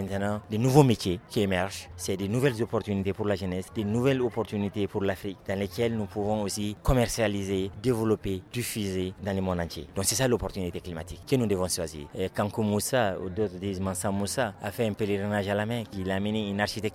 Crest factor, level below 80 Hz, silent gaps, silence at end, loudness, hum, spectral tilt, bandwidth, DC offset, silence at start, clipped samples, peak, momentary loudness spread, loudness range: 22 dB; -48 dBFS; none; 0 s; -28 LUFS; none; -5.5 dB/octave; 16.5 kHz; under 0.1%; 0 s; under 0.1%; -6 dBFS; 7 LU; 3 LU